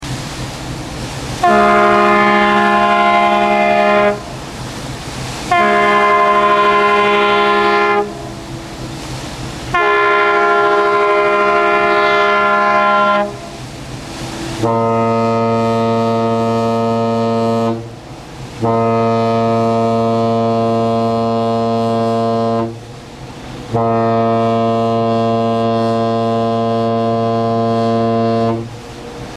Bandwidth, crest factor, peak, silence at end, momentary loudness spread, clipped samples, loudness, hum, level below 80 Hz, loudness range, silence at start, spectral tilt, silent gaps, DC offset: 13.5 kHz; 14 dB; 0 dBFS; 0 s; 15 LU; under 0.1%; -13 LUFS; none; -42 dBFS; 5 LU; 0 s; -6 dB/octave; none; under 0.1%